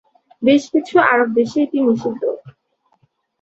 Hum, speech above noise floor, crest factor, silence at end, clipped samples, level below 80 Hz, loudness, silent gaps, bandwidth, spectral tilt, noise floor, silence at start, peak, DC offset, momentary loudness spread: none; 48 dB; 16 dB; 0.9 s; under 0.1%; -62 dBFS; -16 LUFS; none; 8 kHz; -5.5 dB/octave; -64 dBFS; 0.4 s; -2 dBFS; under 0.1%; 10 LU